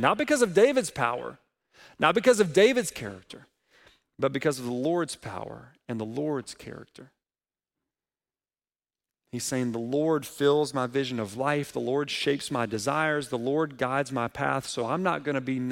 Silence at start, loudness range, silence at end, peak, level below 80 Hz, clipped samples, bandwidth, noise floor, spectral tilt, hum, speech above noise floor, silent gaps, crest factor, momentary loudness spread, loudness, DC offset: 0 s; 13 LU; 0 s; -6 dBFS; -64 dBFS; under 0.1%; 16.5 kHz; under -90 dBFS; -4.5 dB/octave; none; over 63 dB; none; 22 dB; 17 LU; -27 LUFS; under 0.1%